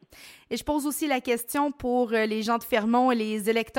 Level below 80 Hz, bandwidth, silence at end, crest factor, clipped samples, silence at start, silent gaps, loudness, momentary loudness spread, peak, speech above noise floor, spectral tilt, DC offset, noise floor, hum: -56 dBFS; 17 kHz; 0 s; 16 dB; under 0.1%; 0.2 s; none; -26 LUFS; 5 LU; -10 dBFS; 25 dB; -4 dB/octave; under 0.1%; -51 dBFS; none